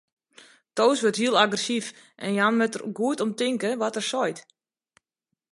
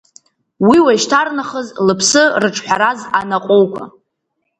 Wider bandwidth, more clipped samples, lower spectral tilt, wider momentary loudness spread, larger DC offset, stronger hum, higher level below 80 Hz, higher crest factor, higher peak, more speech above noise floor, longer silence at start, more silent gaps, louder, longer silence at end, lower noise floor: about the same, 11.5 kHz vs 11 kHz; neither; about the same, -3.5 dB/octave vs -3.5 dB/octave; about the same, 9 LU vs 8 LU; neither; neither; second, -78 dBFS vs -56 dBFS; first, 22 dB vs 14 dB; second, -4 dBFS vs 0 dBFS; about the same, 59 dB vs 58 dB; first, 0.75 s vs 0.6 s; neither; second, -24 LUFS vs -13 LUFS; first, 1.1 s vs 0.7 s; first, -83 dBFS vs -71 dBFS